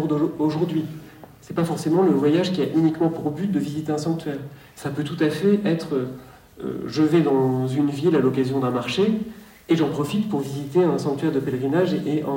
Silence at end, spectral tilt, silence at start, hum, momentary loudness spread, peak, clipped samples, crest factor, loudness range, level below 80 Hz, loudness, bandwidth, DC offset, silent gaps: 0 s; -7 dB/octave; 0 s; none; 12 LU; -6 dBFS; under 0.1%; 16 dB; 3 LU; -60 dBFS; -22 LUFS; 16.5 kHz; under 0.1%; none